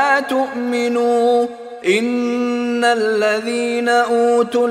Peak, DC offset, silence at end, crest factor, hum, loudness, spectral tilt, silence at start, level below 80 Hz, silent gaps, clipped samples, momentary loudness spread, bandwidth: -2 dBFS; under 0.1%; 0 s; 14 dB; none; -17 LUFS; -3.5 dB/octave; 0 s; -68 dBFS; none; under 0.1%; 5 LU; 13.5 kHz